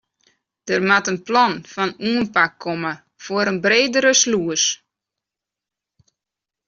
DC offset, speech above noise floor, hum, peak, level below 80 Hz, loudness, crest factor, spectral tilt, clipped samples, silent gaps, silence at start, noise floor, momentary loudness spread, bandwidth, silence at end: under 0.1%; 68 dB; none; -2 dBFS; -62 dBFS; -18 LUFS; 18 dB; -2 dB/octave; under 0.1%; none; 0.65 s; -86 dBFS; 11 LU; 7.6 kHz; 1.9 s